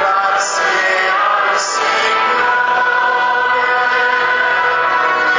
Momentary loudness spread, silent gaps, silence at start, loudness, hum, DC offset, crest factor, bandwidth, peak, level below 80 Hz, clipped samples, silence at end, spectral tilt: 1 LU; none; 0 s; -13 LUFS; none; under 0.1%; 12 dB; 7.8 kHz; -2 dBFS; -58 dBFS; under 0.1%; 0 s; -0.5 dB/octave